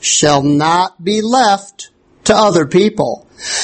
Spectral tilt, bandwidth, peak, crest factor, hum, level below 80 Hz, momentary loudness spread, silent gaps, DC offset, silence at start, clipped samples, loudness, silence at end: -3.5 dB/octave; 8.8 kHz; 0 dBFS; 14 dB; none; -48 dBFS; 9 LU; none; under 0.1%; 0 s; under 0.1%; -13 LUFS; 0 s